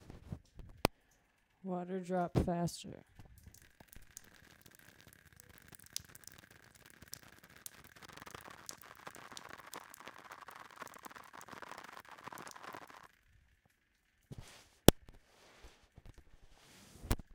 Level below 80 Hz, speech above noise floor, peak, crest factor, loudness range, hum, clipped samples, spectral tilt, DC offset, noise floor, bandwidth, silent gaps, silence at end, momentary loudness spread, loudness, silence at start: -52 dBFS; 39 dB; 0 dBFS; 42 dB; 16 LU; none; under 0.1%; -4.5 dB/octave; under 0.1%; -76 dBFS; 18 kHz; none; 0 s; 24 LU; -40 LUFS; 0 s